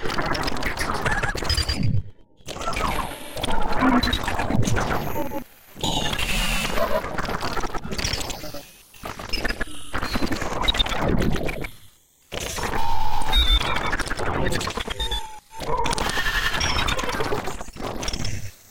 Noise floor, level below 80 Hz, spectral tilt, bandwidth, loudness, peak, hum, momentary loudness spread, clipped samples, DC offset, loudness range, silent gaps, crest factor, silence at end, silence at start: -52 dBFS; -30 dBFS; -4 dB/octave; 17 kHz; -25 LUFS; -6 dBFS; none; 12 LU; under 0.1%; 2%; 3 LU; none; 18 dB; 0 s; 0 s